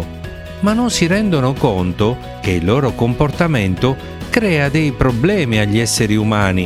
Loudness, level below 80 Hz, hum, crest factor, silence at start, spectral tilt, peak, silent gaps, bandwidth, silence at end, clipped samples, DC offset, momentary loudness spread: -16 LUFS; -34 dBFS; none; 16 dB; 0 s; -5.5 dB/octave; 0 dBFS; none; 15.5 kHz; 0 s; under 0.1%; 0.1%; 5 LU